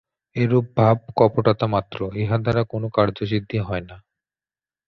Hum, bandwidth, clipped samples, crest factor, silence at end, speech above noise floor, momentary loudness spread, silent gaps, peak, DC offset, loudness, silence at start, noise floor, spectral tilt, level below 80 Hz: none; 6 kHz; under 0.1%; 20 dB; 0.9 s; over 70 dB; 9 LU; none; -2 dBFS; under 0.1%; -21 LUFS; 0.35 s; under -90 dBFS; -9.5 dB/octave; -48 dBFS